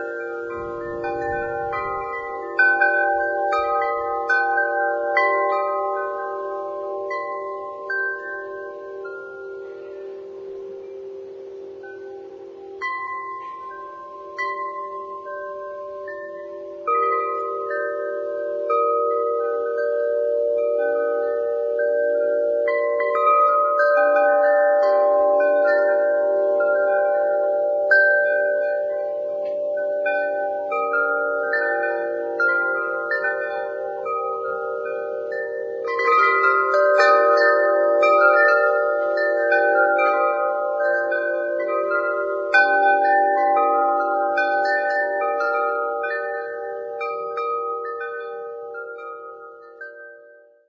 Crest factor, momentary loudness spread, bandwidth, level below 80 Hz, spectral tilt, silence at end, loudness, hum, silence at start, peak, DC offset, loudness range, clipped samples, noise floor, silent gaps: 18 dB; 18 LU; 7.4 kHz; -62 dBFS; -4.5 dB/octave; 0.4 s; -20 LUFS; none; 0 s; -4 dBFS; under 0.1%; 14 LU; under 0.1%; -49 dBFS; none